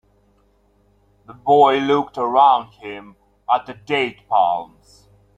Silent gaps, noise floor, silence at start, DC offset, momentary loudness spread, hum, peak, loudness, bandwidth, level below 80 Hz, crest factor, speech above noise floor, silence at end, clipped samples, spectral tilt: none; -59 dBFS; 1.3 s; under 0.1%; 20 LU; 50 Hz at -55 dBFS; -2 dBFS; -18 LUFS; 8.8 kHz; -60 dBFS; 18 dB; 41 dB; 0.7 s; under 0.1%; -5.5 dB/octave